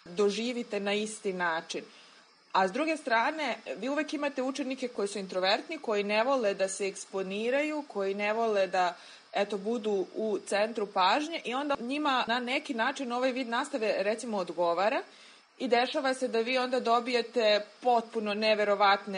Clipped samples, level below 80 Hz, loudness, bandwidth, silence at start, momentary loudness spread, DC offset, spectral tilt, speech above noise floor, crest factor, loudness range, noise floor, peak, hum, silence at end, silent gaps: under 0.1%; -82 dBFS; -30 LUFS; 10.5 kHz; 0.05 s; 7 LU; under 0.1%; -3.5 dB/octave; 29 dB; 18 dB; 3 LU; -58 dBFS; -12 dBFS; none; 0 s; none